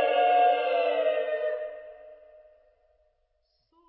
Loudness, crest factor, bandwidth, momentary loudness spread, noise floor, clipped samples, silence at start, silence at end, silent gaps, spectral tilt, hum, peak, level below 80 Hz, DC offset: -25 LUFS; 16 dB; 4.5 kHz; 19 LU; -73 dBFS; under 0.1%; 0 s; 1.75 s; none; -4.5 dB/octave; none; -14 dBFS; -76 dBFS; under 0.1%